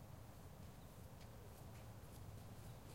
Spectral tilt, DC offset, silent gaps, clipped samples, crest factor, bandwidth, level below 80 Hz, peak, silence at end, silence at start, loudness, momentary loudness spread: -5.5 dB/octave; under 0.1%; none; under 0.1%; 12 dB; 16.5 kHz; -66 dBFS; -44 dBFS; 0 s; 0 s; -58 LUFS; 2 LU